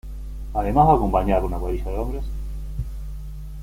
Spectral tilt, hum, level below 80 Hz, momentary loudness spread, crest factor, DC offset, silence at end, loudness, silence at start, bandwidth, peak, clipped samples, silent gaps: -8.5 dB/octave; none; -28 dBFS; 19 LU; 18 dB; under 0.1%; 0 s; -23 LUFS; 0.05 s; 15.5 kHz; -4 dBFS; under 0.1%; none